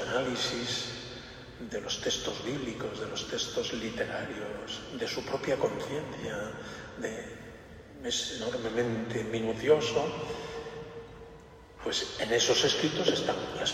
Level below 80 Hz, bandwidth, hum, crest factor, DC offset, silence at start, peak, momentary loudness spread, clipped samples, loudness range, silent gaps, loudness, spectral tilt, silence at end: -58 dBFS; 15.5 kHz; none; 22 dB; under 0.1%; 0 s; -10 dBFS; 18 LU; under 0.1%; 5 LU; none; -32 LUFS; -3 dB/octave; 0 s